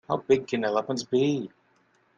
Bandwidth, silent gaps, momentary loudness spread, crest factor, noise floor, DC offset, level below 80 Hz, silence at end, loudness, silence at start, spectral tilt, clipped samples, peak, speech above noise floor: 7.6 kHz; none; 6 LU; 18 dB; -66 dBFS; under 0.1%; -68 dBFS; 0.7 s; -26 LUFS; 0.1 s; -5.5 dB/octave; under 0.1%; -10 dBFS; 40 dB